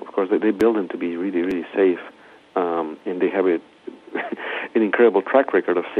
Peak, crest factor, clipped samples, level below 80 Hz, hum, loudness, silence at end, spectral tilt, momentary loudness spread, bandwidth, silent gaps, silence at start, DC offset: -4 dBFS; 18 dB; under 0.1%; -66 dBFS; none; -21 LUFS; 0 s; -7 dB/octave; 13 LU; 8 kHz; none; 0 s; under 0.1%